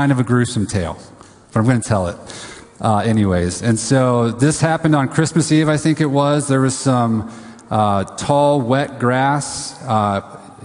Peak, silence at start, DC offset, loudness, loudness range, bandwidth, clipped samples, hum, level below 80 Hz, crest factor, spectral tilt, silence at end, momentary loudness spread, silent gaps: 0 dBFS; 0 s; under 0.1%; -17 LUFS; 4 LU; 11 kHz; under 0.1%; none; -40 dBFS; 16 dB; -6 dB/octave; 0 s; 10 LU; none